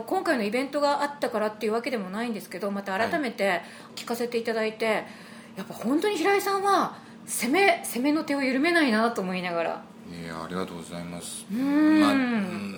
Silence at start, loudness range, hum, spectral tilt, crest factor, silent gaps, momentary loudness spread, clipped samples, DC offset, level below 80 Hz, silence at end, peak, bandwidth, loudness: 0 s; 5 LU; none; -4.5 dB/octave; 20 dB; none; 15 LU; under 0.1%; under 0.1%; -70 dBFS; 0 s; -6 dBFS; over 20 kHz; -26 LUFS